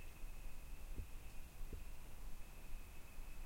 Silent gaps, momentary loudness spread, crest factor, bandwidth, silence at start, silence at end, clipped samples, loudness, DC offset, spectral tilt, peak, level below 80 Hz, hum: none; 4 LU; 14 dB; 16.5 kHz; 0 s; 0 s; under 0.1%; -57 LUFS; under 0.1%; -4.5 dB/octave; -34 dBFS; -50 dBFS; none